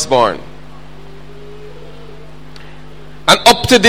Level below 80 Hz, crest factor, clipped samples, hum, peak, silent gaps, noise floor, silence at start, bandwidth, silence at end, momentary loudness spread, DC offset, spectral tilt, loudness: -40 dBFS; 16 dB; 0.2%; none; 0 dBFS; none; -36 dBFS; 0 s; over 20 kHz; 0 s; 28 LU; 3%; -3 dB/octave; -10 LUFS